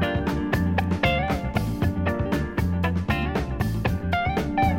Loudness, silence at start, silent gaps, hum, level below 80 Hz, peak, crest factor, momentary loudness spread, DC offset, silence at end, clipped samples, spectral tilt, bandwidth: -25 LUFS; 0 s; none; none; -34 dBFS; -8 dBFS; 16 dB; 3 LU; under 0.1%; 0 s; under 0.1%; -7 dB/octave; 16.5 kHz